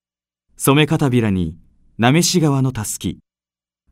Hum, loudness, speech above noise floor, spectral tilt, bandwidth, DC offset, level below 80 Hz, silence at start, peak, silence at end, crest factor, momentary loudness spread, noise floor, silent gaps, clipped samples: 60 Hz at -35 dBFS; -17 LUFS; over 74 dB; -5 dB/octave; 16 kHz; under 0.1%; -46 dBFS; 0.6 s; 0 dBFS; 0.8 s; 18 dB; 10 LU; under -90 dBFS; none; under 0.1%